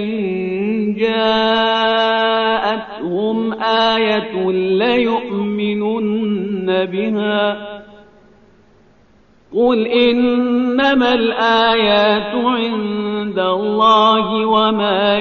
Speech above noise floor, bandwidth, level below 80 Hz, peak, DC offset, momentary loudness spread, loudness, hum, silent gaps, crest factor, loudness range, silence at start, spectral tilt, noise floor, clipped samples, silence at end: 37 dB; 6.6 kHz; -52 dBFS; -2 dBFS; 0.1%; 8 LU; -16 LUFS; 50 Hz at -60 dBFS; none; 14 dB; 6 LU; 0 s; -2.5 dB/octave; -51 dBFS; under 0.1%; 0 s